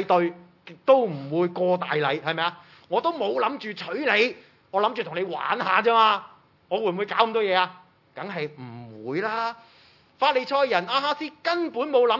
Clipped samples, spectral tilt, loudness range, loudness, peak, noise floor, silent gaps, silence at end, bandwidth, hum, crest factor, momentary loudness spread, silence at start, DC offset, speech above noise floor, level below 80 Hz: under 0.1%; -6 dB/octave; 4 LU; -24 LUFS; -4 dBFS; -56 dBFS; none; 0 s; 6 kHz; none; 22 dB; 11 LU; 0 s; under 0.1%; 32 dB; -82 dBFS